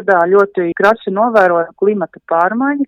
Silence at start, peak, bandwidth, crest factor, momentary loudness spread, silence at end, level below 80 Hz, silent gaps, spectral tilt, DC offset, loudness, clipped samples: 0 s; 0 dBFS; 7.2 kHz; 12 dB; 5 LU; 0 s; -58 dBFS; none; -7.5 dB/octave; under 0.1%; -13 LUFS; under 0.1%